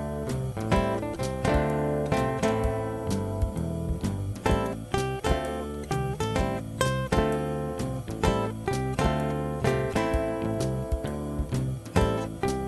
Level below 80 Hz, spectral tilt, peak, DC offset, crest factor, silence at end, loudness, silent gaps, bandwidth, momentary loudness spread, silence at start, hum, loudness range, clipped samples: -36 dBFS; -6 dB/octave; -8 dBFS; under 0.1%; 20 dB; 0 s; -28 LUFS; none; 12 kHz; 5 LU; 0 s; none; 2 LU; under 0.1%